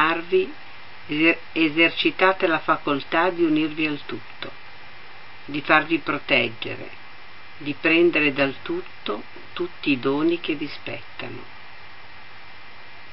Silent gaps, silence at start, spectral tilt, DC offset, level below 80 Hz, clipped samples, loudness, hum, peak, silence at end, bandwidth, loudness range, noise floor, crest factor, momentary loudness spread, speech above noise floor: none; 0 s; -9.5 dB/octave; 2%; -62 dBFS; under 0.1%; -22 LUFS; none; 0 dBFS; 0 s; 5.8 kHz; 7 LU; -45 dBFS; 24 dB; 24 LU; 22 dB